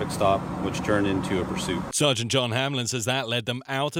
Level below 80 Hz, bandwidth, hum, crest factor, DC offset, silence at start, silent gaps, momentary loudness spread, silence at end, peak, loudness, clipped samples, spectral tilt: -50 dBFS; 16 kHz; none; 18 dB; under 0.1%; 0 s; none; 5 LU; 0 s; -8 dBFS; -25 LUFS; under 0.1%; -4 dB/octave